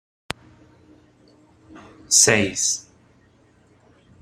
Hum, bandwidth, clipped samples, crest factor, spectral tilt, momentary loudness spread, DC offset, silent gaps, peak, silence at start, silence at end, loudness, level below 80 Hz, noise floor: none; 16 kHz; under 0.1%; 24 dB; -1.5 dB/octave; 21 LU; under 0.1%; none; -2 dBFS; 1.75 s; 1.4 s; -17 LUFS; -58 dBFS; -56 dBFS